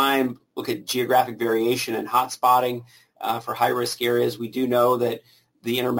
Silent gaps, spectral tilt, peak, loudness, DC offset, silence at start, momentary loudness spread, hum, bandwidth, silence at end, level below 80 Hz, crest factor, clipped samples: none; -4 dB/octave; -6 dBFS; -23 LUFS; under 0.1%; 0 s; 10 LU; none; 17 kHz; 0 s; -68 dBFS; 16 dB; under 0.1%